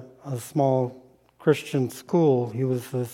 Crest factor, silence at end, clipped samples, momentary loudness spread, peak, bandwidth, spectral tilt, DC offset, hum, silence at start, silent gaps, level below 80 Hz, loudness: 18 dB; 0 s; under 0.1%; 9 LU; -8 dBFS; 16.5 kHz; -7 dB/octave; under 0.1%; none; 0 s; none; -70 dBFS; -25 LUFS